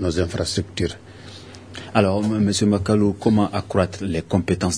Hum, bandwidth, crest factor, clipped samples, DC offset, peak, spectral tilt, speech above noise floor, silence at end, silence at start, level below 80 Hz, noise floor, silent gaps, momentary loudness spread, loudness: none; 11 kHz; 20 dB; under 0.1%; 0.2%; 0 dBFS; -5.5 dB/octave; 19 dB; 0 s; 0 s; -44 dBFS; -40 dBFS; none; 19 LU; -21 LUFS